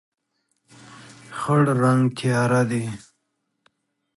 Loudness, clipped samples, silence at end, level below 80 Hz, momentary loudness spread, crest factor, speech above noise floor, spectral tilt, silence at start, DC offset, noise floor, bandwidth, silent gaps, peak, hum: -21 LUFS; under 0.1%; 1.2 s; -62 dBFS; 15 LU; 18 dB; 55 dB; -7 dB/octave; 0.9 s; under 0.1%; -75 dBFS; 11.5 kHz; none; -6 dBFS; none